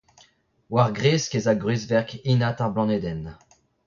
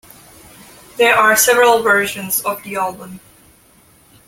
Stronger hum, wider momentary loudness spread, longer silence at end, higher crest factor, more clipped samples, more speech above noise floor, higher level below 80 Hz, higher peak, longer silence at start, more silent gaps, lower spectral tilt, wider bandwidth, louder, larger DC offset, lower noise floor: neither; second, 7 LU vs 20 LU; second, 0.55 s vs 1.1 s; about the same, 18 dB vs 18 dB; neither; about the same, 37 dB vs 35 dB; about the same, -52 dBFS vs -56 dBFS; second, -6 dBFS vs 0 dBFS; second, 0.7 s vs 0.95 s; neither; first, -6 dB/octave vs -1.5 dB/octave; second, 7.4 kHz vs 17 kHz; second, -23 LUFS vs -14 LUFS; neither; first, -60 dBFS vs -50 dBFS